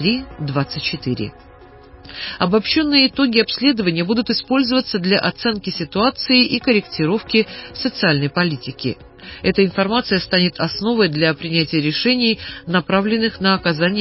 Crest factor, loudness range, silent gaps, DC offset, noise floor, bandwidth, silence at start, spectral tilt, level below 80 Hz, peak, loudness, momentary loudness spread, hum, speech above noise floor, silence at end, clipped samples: 16 dB; 2 LU; none; under 0.1%; -42 dBFS; 5.8 kHz; 0 s; -9 dB/octave; -46 dBFS; -2 dBFS; -17 LUFS; 10 LU; none; 24 dB; 0 s; under 0.1%